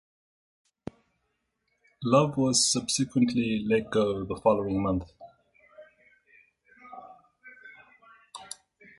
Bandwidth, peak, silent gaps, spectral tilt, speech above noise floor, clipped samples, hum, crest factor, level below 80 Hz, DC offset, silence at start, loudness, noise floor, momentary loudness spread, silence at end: 11.5 kHz; -8 dBFS; none; -4 dB/octave; 52 dB; under 0.1%; none; 22 dB; -56 dBFS; under 0.1%; 2 s; -26 LUFS; -78 dBFS; 24 LU; 0.5 s